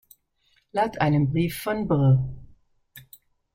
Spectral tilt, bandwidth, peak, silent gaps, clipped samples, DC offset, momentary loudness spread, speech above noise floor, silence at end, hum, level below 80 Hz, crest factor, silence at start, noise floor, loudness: -7.5 dB/octave; 16.5 kHz; -10 dBFS; none; under 0.1%; under 0.1%; 9 LU; 45 dB; 0.55 s; none; -50 dBFS; 16 dB; 0.75 s; -67 dBFS; -24 LUFS